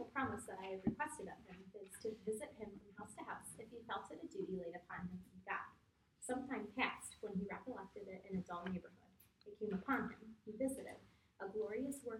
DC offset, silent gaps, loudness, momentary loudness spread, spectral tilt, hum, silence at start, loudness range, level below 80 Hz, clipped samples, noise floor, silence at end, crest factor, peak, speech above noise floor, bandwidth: under 0.1%; none; -47 LUFS; 14 LU; -5 dB/octave; none; 0 s; 3 LU; -72 dBFS; under 0.1%; -74 dBFS; 0 s; 22 dB; -24 dBFS; 29 dB; 16 kHz